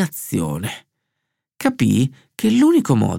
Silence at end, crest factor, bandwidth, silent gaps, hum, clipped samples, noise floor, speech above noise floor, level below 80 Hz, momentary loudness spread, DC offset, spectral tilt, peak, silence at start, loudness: 0 s; 18 dB; 17 kHz; none; none; under 0.1%; -78 dBFS; 61 dB; -52 dBFS; 12 LU; under 0.1%; -6 dB/octave; -2 dBFS; 0 s; -18 LUFS